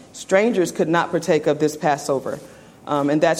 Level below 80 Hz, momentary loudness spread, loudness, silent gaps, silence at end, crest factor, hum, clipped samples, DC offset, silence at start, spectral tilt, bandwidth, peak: -60 dBFS; 9 LU; -20 LUFS; none; 0 s; 16 dB; none; under 0.1%; under 0.1%; 0.15 s; -5 dB/octave; 16 kHz; -4 dBFS